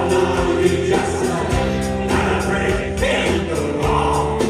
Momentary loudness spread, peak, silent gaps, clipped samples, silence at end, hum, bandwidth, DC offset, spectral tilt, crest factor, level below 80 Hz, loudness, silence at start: 3 LU; -4 dBFS; none; under 0.1%; 0 s; none; 13.5 kHz; under 0.1%; -5.5 dB/octave; 14 dB; -30 dBFS; -18 LUFS; 0 s